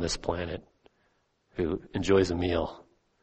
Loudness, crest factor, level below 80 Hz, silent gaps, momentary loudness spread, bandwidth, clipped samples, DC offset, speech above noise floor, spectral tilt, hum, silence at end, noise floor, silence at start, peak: -29 LUFS; 20 dB; -48 dBFS; none; 13 LU; 8.4 kHz; under 0.1%; under 0.1%; 43 dB; -5.5 dB/octave; none; 0.4 s; -71 dBFS; 0 s; -12 dBFS